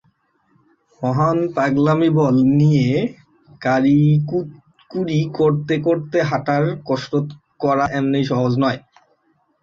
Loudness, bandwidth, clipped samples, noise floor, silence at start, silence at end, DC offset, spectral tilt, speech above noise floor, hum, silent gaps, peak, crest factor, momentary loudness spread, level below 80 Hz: -18 LUFS; 7.4 kHz; under 0.1%; -63 dBFS; 1 s; 0.85 s; under 0.1%; -8 dB/octave; 46 dB; none; none; -4 dBFS; 14 dB; 11 LU; -54 dBFS